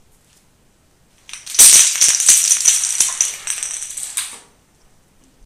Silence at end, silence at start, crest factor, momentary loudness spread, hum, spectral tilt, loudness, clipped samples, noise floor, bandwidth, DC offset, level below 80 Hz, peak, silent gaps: 1.05 s; 1.35 s; 16 dB; 18 LU; none; 3.5 dB/octave; -11 LUFS; 0.2%; -55 dBFS; over 20 kHz; under 0.1%; -56 dBFS; 0 dBFS; none